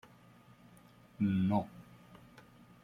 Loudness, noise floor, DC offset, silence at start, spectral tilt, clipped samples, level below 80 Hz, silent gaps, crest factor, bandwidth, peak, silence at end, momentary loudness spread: -34 LUFS; -61 dBFS; under 0.1%; 1.2 s; -9 dB/octave; under 0.1%; -70 dBFS; none; 20 dB; 10 kHz; -18 dBFS; 1.05 s; 26 LU